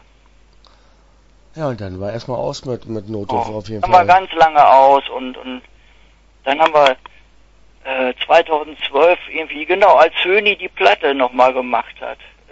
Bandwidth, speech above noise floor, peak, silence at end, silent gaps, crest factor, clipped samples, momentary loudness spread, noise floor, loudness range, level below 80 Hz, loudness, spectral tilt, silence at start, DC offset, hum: 8 kHz; 35 dB; 0 dBFS; 0.35 s; none; 16 dB; under 0.1%; 17 LU; -49 dBFS; 8 LU; -48 dBFS; -15 LUFS; -5 dB/octave; 1.55 s; under 0.1%; none